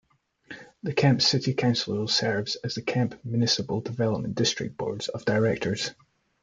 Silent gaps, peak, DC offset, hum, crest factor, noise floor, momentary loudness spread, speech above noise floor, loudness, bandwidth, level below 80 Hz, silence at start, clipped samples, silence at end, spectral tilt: none; -8 dBFS; under 0.1%; none; 18 dB; -49 dBFS; 9 LU; 23 dB; -26 LUFS; 9.2 kHz; -62 dBFS; 0.5 s; under 0.1%; 0.5 s; -4.5 dB/octave